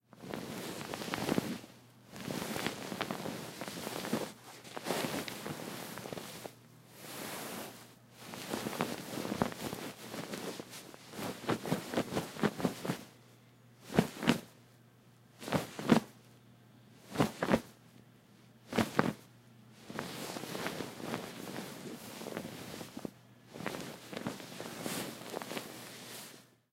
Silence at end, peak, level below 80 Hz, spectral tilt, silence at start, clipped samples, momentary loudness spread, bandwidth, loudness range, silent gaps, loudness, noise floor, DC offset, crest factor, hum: 0.25 s; -8 dBFS; -68 dBFS; -4.5 dB/octave; 0.15 s; under 0.1%; 17 LU; 16 kHz; 7 LU; none; -39 LUFS; -62 dBFS; under 0.1%; 32 dB; none